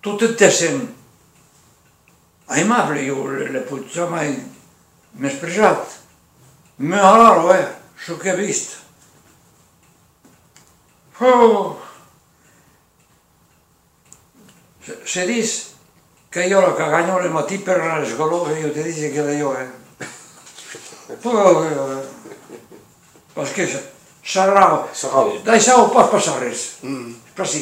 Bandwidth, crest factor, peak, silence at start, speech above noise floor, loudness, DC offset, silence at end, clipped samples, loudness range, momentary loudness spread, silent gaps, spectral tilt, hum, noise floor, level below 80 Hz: 16 kHz; 20 dB; 0 dBFS; 0.05 s; 40 dB; -17 LUFS; under 0.1%; 0 s; under 0.1%; 9 LU; 22 LU; none; -3.5 dB/octave; none; -57 dBFS; -62 dBFS